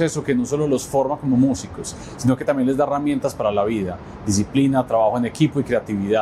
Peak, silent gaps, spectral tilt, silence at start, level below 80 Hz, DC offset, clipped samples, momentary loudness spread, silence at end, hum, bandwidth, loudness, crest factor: -6 dBFS; none; -6 dB/octave; 0 s; -46 dBFS; under 0.1%; under 0.1%; 7 LU; 0 s; none; 14.5 kHz; -20 LUFS; 14 dB